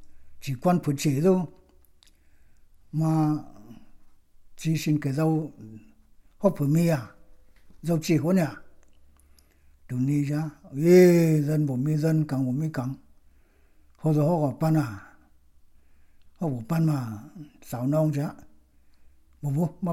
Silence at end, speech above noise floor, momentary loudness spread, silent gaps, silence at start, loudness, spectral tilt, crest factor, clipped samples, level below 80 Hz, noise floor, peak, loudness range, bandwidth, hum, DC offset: 0 s; 34 dB; 15 LU; none; 0 s; -25 LUFS; -7.5 dB/octave; 20 dB; under 0.1%; -58 dBFS; -58 dBFS; -6 dBFS; 7 LU; 16.5 kHz; none; under 0.1%